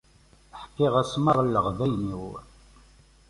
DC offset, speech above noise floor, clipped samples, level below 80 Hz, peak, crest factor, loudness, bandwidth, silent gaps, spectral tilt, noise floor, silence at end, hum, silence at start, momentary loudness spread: under 0.1%; 33 dB; under 0.1%; -50 dBFS; -8 dBFS; 20 dB; -25 LUFS; 11.5 kHz; none; -7 dB/octave; -57 dBFS; 0.85 s; none; 0.55 s; 20 LU